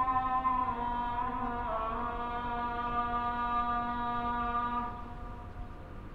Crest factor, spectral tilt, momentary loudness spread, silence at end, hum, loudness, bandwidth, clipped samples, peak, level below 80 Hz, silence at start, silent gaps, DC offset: 16 dB; -7.5 dB/octave; 15 LU; 0 s; none; -33 LUFS; 6.6 kHz; under 0.1%; -18 dBFS; -46 dBFS; 0 s; none; under 0.1%